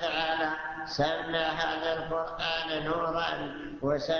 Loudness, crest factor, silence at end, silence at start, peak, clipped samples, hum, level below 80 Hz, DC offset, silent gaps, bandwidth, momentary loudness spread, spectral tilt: -31 LUFS; 16 dB; 0 s; 0 s; -14 dBFS; under 0.1%; none; -54 dBFS; under 0.1%; none; 7 kHz; 6 LU; -4.5 dB/octave